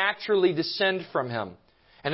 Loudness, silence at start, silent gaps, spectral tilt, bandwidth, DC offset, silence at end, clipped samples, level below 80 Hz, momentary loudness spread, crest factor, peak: -26 LUFS; 0 s; none; -8.5 dB/octave; 5.8 kHz; under 0.1%; 0 s; under 0.1%; -68 dBFS; 11 LU; 18 dB; -10 dBFS